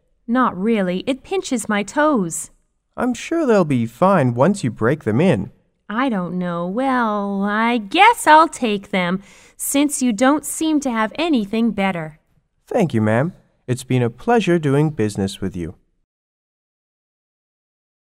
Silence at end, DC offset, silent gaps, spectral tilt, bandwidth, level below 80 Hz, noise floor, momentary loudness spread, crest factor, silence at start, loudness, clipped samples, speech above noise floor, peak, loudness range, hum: 2.45 s; under 0.1%; none; -5.5 dB/octave; 16 kHz; -52 dBFS; -58 dBFS; 10 LU; 18 dB; 0.3 s; -18 LUFS; under 0.1%; 40 dB; 0 dBFS; 5 LU; none